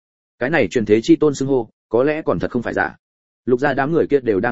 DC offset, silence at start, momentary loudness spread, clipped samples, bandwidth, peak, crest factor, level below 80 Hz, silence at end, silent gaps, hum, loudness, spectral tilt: 0.9%; 0.4 s; 7 LU; under 0.1%; 8 kHz; -2 dBFS; 16 dB; -50 dBFS; 0 s; 1.73-1.90 s, 2.99-3.43 s; none; -18 LUFS; -6.5 dB/octave